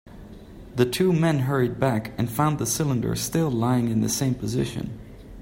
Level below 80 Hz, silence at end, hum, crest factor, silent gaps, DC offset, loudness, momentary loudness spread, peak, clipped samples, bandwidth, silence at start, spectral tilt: -48 dBFS; 0 s; none; 18 dB; none; under 0.1%; -24 LUFS; 15 LU; -6 dBFS; under 0.1%; 16.5 kHz; 0.05 s; -5.5 dB/octave